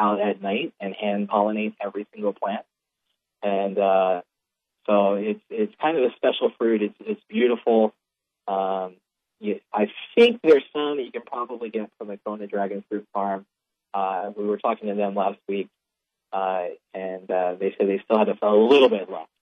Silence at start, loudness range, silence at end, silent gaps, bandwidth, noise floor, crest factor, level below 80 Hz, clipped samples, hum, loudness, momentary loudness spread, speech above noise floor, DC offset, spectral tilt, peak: 0 s; 6 LU; 0.15 s; none; 6.8 kHz; -83 dBFS; 20 dB; -78 dBFS; under 0.1%; none; -24 LUFS; 14 LU; 60 dB; under 0.1%; -7 dB/octave; -4 dBFS